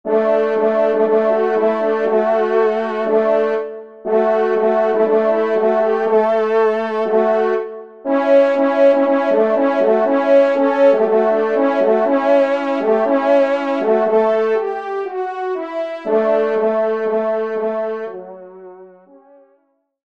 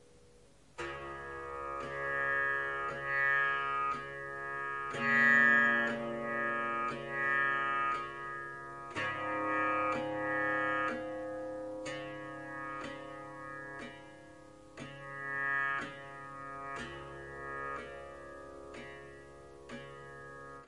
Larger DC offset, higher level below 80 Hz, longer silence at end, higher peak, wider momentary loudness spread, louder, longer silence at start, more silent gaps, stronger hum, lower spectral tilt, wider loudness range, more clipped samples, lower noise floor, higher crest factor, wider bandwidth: first, 0.3% vs under 0.1%; about the same, -68 dBFS vs -66 dBFS; first, 1.2 s vs 0 s; first, -2 dBFS vs -16 dBFS; second, 10 LU vs 19 LU; first, -16 LUFS vs -33 LUFS; second, 0.05 s vs 0.75 s; neither; neither; first, -6.5 dB/octave vs -5 dB/octave; second, 5 LU vs 15 LU; neither; about the same, -62 dBFS vs -62 dBFS; second, 14 dB vs 20 dB; second, 6.8 kHz vs 11.5 kHz